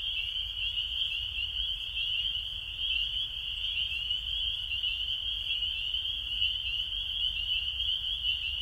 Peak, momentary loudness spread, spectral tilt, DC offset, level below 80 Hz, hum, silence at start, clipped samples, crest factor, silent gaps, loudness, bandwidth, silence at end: -18 dBFS; 3 LU; -1 dB/octave; under 0.1%; -48 dBFS; none; 0 s; under 0.1%; 16 dB; none; -30 LUFS; 16 kHz; 0 s